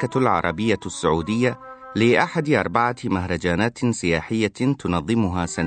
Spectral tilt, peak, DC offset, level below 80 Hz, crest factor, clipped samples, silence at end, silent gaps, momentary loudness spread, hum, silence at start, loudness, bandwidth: -5.5 dB/octave; -2 dBFS; under 0.1%; -46 dBFS; 18 dB; under 0.1%; 0 s; none; 5 LU; none; 0 s; -22 LUFS; 9.2 kHz